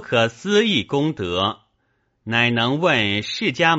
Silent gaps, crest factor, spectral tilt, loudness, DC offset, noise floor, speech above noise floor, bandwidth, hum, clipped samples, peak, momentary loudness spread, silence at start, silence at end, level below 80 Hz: none; 18 dB; -3 dB/octave; -19 LUFS; under 0.1%; -68 dBFS; 48 dB; 8 kHz; none; under 0.1%; -2 dBFS; 6 LU; 0 s; 0 s; -56 dBFS